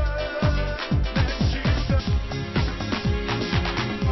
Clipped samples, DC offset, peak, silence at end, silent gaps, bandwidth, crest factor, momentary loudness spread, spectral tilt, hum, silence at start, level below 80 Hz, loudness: under 0.1%; under 0.1%; -8 dBFS; 0 s; none; 6.2 kHz; 14 dB; 3 LU; -6.5 dB/octave; none; 0 s; -28 dBFS; -25 LUFS